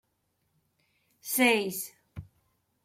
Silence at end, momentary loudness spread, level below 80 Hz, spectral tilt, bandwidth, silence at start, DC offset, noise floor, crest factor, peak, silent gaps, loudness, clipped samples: 0.6 s; 25 LU; -66 dBFS; -2.5 dB/octave; 16.5 kHz; 1.25 s; under 0.1%; -76 dBFS; 22 dB; -10 dBFS; none; -27 LUFS; under 0.1%